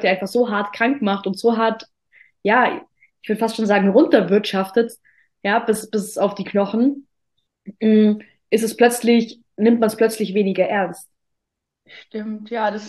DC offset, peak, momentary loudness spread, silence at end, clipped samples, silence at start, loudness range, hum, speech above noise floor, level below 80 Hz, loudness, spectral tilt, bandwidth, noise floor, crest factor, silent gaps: under 0.1%; -2 dBFS; 12 LU; 0 s; under 0.1%; 0 s; 3 LU; none; 62 dB; -68 dBFS; -19 LUFS; -5.5 dB/octave; 12.5 kHz; -81 dBFS; 18 dB; none